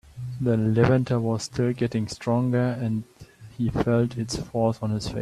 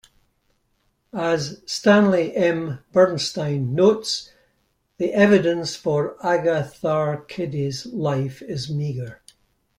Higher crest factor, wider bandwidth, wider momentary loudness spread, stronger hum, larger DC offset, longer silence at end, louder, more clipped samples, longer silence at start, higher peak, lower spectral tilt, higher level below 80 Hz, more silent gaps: about the same, 20 dB vs 18 dB; about the same, 12 kHz vs 12 kHz; second, 9 LU vs 12 LU; neither; neither; second, 0 s vs 0.65 s; second, -25 LUFS vs -21 LUFS; neither; second, 0.15 s vs 1.15 s; about the same, -6 dBFS vs -4 dBFS; first, -7 dB/octave vs -5.5 dB/octave; first, -48 dBFS vs -60 dBFS; neither